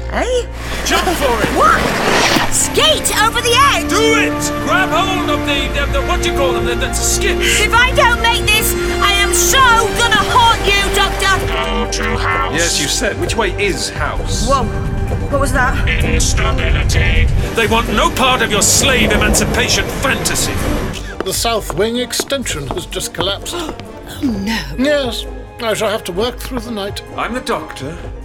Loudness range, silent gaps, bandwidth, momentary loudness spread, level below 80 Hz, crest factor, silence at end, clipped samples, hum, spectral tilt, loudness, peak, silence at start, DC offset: 8 LU; none; 19 kHz; 11 LU; -22 dBFS; 14 dB; 0 s; under 0.1%; none; -3 dB/octave; -14 LUFS; 0 dBFS; 0 s; under 0.1%